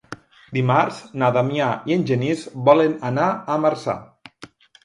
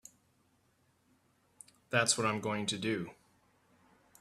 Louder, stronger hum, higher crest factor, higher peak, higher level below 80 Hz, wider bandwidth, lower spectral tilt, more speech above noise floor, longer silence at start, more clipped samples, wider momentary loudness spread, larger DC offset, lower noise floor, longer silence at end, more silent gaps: first, -20 LUFS vs -33 LUFS; neither; second, 20 dB vs 26 dB; first, 0 dBFS vs -14 dBFS; first, -62 dBFS vs -76 dBFS; second, 11 kHz vs 14 kHz; first, -7 dB/octave vs -3 dB/octave; second, 26 dB vs 40 dB; second, 0.1 s vs 1.9 s; neither; about the same, 11 LU vs 9 LU; neither; second, -46 dBFS vs -73 dBFS; second, 0.4 s vs 1.1 s; neither